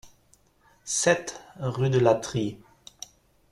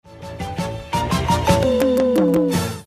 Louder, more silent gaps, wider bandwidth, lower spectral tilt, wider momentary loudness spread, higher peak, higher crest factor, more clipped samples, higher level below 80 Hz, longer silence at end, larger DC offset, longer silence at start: second, -25 LUFS vs -19 LUFS; neither; second, 13.5 kHz vs 15.5 kHz; second, -4.5 dB/octave vs -6 dB/octave; first, 22 LU vs 12 LU; second, -6 dBFS vs -2 dBFS; about the same, 22 dB vs 18 dB; neither; second, -60 dBFS vs -36 dBFS; first, 0.95 s vs 0.05 s; neither; about the same, 0.05 s vs 0.05 s